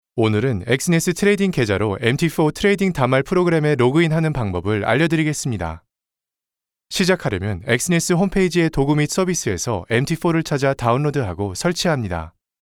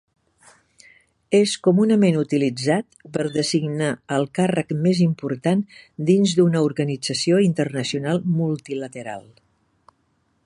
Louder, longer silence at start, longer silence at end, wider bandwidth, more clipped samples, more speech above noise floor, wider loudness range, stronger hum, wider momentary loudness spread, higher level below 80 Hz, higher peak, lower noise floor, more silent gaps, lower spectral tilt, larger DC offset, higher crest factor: about the same, -19 LUFS vs -21 LUFS; second, 0.15 s vs 1.3 s; second, 0.35 s vs 1.25 s; first, 17 kHz vs 11.5 kHz; neither; first, 70 dB vs 46 dB; about the same, 4 LU vs 3 LU; neither; second, 6 LU vs 10 LU; first, -42 dBFS vs -64 dBFS; about the same, -4 dBFS vs -4 dBFS; first, -88 dBFS vs -67 dBFS; neither; about the same, -5.5 dB/octave vs -6 dB/octave; neither; about the same, 16 dB vs 16 dB